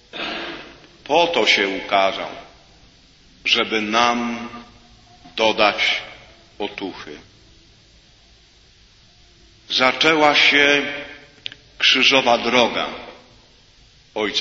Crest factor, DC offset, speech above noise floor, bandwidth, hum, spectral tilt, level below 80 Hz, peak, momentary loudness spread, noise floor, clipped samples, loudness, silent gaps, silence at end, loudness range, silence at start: 22 dB; under 0.1%; 34 dB; 8 kHz; none; -2.5 dB/octave; -54 dBFS; 0 dBFS; 21 LU; -52 dBFS; under 0.1%; -17 LUFS; none; 0 s; 11 LU; 0.15 s